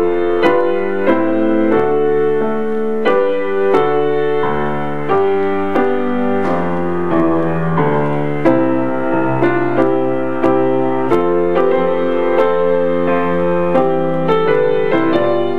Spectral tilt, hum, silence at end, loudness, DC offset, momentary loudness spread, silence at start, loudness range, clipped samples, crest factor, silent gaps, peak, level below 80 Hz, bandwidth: -8.5 dB/octave; none; 0 s; -15 LUFS; 9%; 3 LU; 0 s; 1 LU; under 0.1%; 14 dB; none; 0 dBFS; -50 dBFS; 6.4 kHz